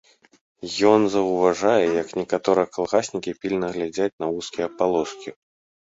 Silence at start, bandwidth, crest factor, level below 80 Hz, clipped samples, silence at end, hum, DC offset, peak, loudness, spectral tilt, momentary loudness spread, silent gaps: 0.6 s; 8 kHz; 20 dB; -60 dBFS; under 0.1%; 0.55 s; none; under 0.1%; -2 dBFS; -22 LUFS; -5 dB/octave; 11 LU; 4.13-4.18 s